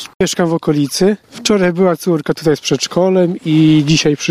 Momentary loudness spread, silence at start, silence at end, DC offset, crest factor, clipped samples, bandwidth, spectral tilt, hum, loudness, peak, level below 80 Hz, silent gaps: 5 LU; 0 s; 0 s; under 0.1%; 14 dB; under 0.1%; 15.5 kHz; -5 dB/octave; none; -14 LUFS; 0 dBFS; -48 dBFS; 0.15-0.20 s